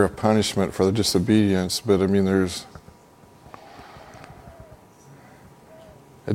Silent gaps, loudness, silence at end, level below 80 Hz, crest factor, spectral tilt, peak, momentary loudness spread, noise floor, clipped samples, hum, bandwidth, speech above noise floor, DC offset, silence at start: none; -21 LUFS; 0 s; -52 dBFS; 22 dB; -5.5 dB/octave; -2 dBFS; 25 LU; -51 dBFS; under 0.1%; none; 16.5 kHz; 30 dB; under 0.1%; 0 s